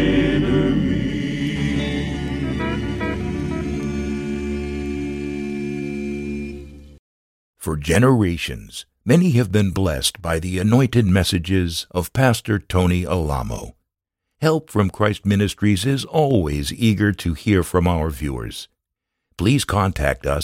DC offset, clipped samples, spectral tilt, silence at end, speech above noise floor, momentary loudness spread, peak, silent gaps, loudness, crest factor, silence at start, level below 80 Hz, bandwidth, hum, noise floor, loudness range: under 0.1%; under 0.1%; -6 dB/octave; 0 s; 62 dB; 10 LU; 0 dBFS; 6.99-7.54 s; -20 LUFS; 20 dB; 0 s; -34 dBFS; 16.5 kHz; none; -80 dBFS; 7 LU